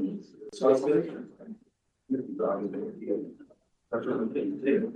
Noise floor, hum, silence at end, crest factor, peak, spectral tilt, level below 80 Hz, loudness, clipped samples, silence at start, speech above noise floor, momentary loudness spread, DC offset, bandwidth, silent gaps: -69 dBFS; none; 0 s; 18 dB; -12 dBFS; -7.5 dB/octave; -74 dBFS; -30 LUFS; under 0.1%; 0 s; 40 dB; 20 LU; under 0.1%; 9.2 kHz; none